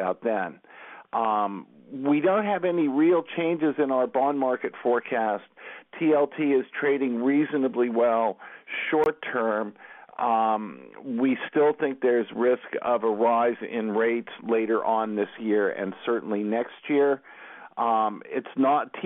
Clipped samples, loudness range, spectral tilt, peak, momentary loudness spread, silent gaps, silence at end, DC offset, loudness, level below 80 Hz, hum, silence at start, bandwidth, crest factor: under 0.1%; 2 LU; -8.5 dB/octave; -12 dBFS; 11 LU; none; 0 s; under 0.1%; -25 LUFS; -74 dBFS; none; 0 s; 4 kHz; 14 dB